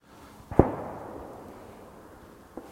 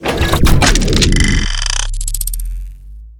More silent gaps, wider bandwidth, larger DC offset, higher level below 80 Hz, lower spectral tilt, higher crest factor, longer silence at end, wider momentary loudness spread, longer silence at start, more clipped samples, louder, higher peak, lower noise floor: neither; second, 16.5 kHz vs 18.5 kHz; neither; second, -44 dBFS vs -16 dBFS; first, -9 dB/octave vs -3.5 dB/octave; first, 32 dB vs 14 dB; about the same, 0 s vs 0.05 s; first, 25 LU vs 15 LU; about the same, 0.1 s vs 0 s; second, under 0.1% vs 0.2%; second, -28 LUFS vs -14 LUFS; about the same, 0 dBFS vs 0 dBFS; first, -50 dBFS vs -32 dBFS